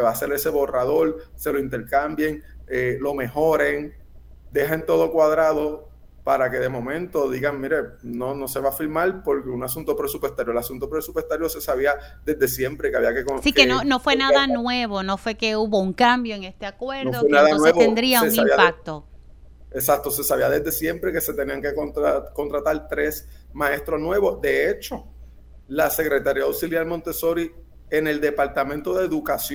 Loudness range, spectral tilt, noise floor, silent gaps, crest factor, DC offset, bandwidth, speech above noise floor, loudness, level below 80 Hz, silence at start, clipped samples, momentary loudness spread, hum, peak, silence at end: 6 LU; -4 dB/octave; -44 dBFS; none; 22 dB; under 0.1%; over 20 kHz; 23 dB; -22 LUFS; -44 dBFS; 0 s; under 0.1%; 11 LU; none; 0 dBFS; 0 s